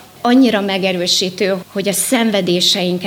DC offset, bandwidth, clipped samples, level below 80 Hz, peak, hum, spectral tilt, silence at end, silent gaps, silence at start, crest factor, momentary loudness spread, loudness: under 0.1%; 19.5 kHz; under 0.1%; -62 dBFS; -2 dBFS; none; -3.5 dB/octave; 0 s; none; 0.25 s; 12 dB; 6 LU; -14 LUFS